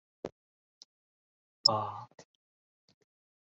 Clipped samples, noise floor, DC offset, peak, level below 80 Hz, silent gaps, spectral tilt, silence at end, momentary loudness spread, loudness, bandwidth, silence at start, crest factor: under 0.1%; under -90 dBFS; under 0.1%; -8 dBFS; -76 dBFS; 0.32-1.64 s; -2.5 dB/octave; 1.2 s; 20 LU; -29 LUFS; 7.4 kHz; 0.25 s; 32 dB